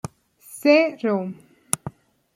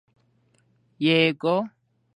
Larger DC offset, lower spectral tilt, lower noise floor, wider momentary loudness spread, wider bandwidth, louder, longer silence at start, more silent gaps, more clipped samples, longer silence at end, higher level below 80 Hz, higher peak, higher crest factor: neither; second, -4 dB/octave vs -7 dB/octave; second, -47 dBFS vs -65 dBFS; first, 22 LU vs 8 LU; first, 16.5 kHz vs 10.5 kHz; about the same, -21 LUFS vs -22 LUFS; second, 0.05 s vs 1 s; neither; neither; about the same, 0.45 s vs 0.45 s; first, -62 dBFS vs -76 dBFS; first, 0 dBFS vs -6 dBFS; about the same, 24 dB vs 20 dB